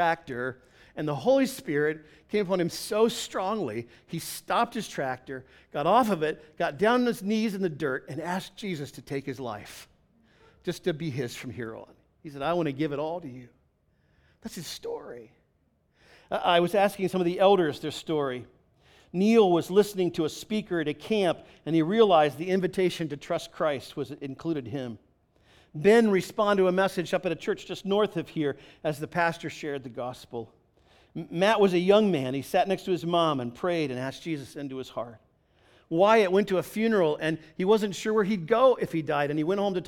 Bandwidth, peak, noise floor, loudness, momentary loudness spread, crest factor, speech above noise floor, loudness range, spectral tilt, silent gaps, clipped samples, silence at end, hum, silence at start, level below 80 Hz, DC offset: 18.5 kHz; -8 dBFS; -69 dBFS; -27 LUFS; 16 LU; 20 dB; 43 dB; 9 LU; -5.5 dB/octave; none; under 0.1%; 0 s; none; 0 s; -64 dBFS; under 0.1%